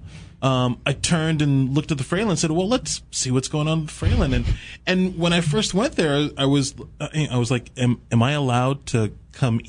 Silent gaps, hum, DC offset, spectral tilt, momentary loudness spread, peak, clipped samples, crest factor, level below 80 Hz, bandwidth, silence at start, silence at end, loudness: none; none; under 0.1%; -5 dB/octave; 6 LU; -6 dBFS; under 0.1%; 16 dB; -36 dBFS; 10.5 kHz; 0 s; 0 s; -22 LUFS